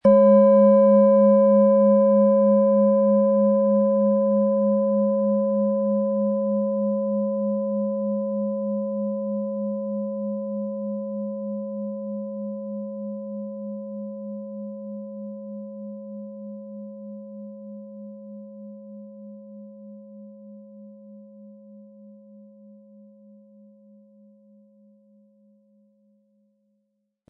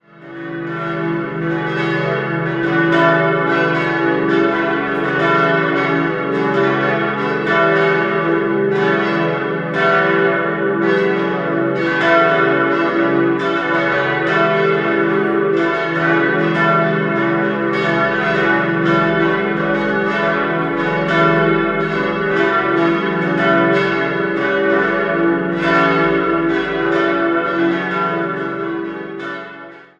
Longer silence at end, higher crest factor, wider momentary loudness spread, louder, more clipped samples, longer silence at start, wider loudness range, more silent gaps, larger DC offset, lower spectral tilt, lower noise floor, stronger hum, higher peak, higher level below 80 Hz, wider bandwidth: first, 5.2 s vs 0.2 s; about the same, 16 dB vs 16 dB; first, 25 LU vs 6 LU; second, -21 LUFS vs -16 LUFS; neither; second, 0.05 s vs 0.2 s; first, 24 LU vs 1 LU; neither; neither; first, -13 dB/octave vs -7.5 dB/octave; first, -75 dBFS vs -36 dBFS; neither; second, -6 dBFS vs 0 dBFS; second, -76 dBFS vs -50 dBFS; second, 2.4 kHz vs 7.6 kHz